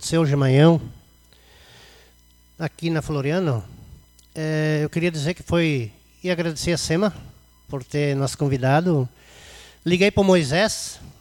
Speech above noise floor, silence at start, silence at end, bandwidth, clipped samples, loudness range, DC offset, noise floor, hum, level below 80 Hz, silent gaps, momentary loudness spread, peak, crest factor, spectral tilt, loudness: 34 dB; 0 s; 0.1 s; 17.5 kHz; under 0.1%; 6 LU; under 0.1%; -54 dBFS; 60 Hz at -55 dBFS; -48 dBFS; none; 15 LU; -4 dBFS; 18 dB; -6 dB/octave; -21 LUFS